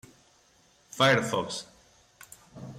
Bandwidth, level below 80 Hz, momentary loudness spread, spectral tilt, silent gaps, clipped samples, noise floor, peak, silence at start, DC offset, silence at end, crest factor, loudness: 16 kHz; -68 dBFS; 27 LU; -4 dB/octave; none; under 0.1%; -63 dBFS; -12 dBFS; 0.95 s; under 0.1%; 0 s; 20 dB; -26 LUFS